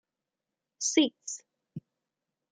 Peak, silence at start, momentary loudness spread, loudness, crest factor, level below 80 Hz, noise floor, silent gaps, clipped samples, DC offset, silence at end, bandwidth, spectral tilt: -10 dBFS; 0.8 s; 22 LU; -29 LUFS; 24 dB; -84 dBFS; -89 dBFS; none; under 0.1%; under 0.1%; 0.75 s; 9.6 kHz; -2 dB/octave